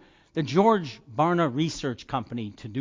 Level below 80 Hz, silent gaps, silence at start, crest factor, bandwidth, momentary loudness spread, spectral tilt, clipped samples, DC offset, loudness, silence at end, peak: -58 dBFS; none; 0.35 s; 18 dB; 7.6 kHz; 14 LU; -6.5 dB/octave; under 0.1%; under 0.1%; -26 LUFS; 0 s; -8 dBFS